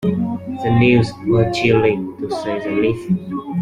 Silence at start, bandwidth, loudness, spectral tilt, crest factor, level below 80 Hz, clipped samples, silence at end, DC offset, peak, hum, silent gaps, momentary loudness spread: 0 s; 10.5 kHz; -18 LUFS; -7.5 dB/octave; 16 dB; -44 dBFS; under 0.1%; 0 s; under 0.1%; -2 dBFS; none; none; 10 LU